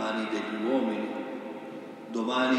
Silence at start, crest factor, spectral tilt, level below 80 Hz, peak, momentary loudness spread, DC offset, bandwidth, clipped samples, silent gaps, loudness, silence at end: 0 s; 16 dB; -5 dB/octave; -86 dBFS; -14 dBFS; 13 LU; under 0.1%; 11 kHz; under 0.1%; none; -32 LUFS; 0 s